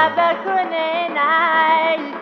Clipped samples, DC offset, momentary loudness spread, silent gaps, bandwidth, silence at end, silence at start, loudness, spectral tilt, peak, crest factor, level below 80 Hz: under 0.1%; under 0.1%; 6 LU; none; 6.2 kHz; 0 s; 0 s; -17 LUFS; -5 dB/octave; -4 dBFS; 14 dB; -76 dBFS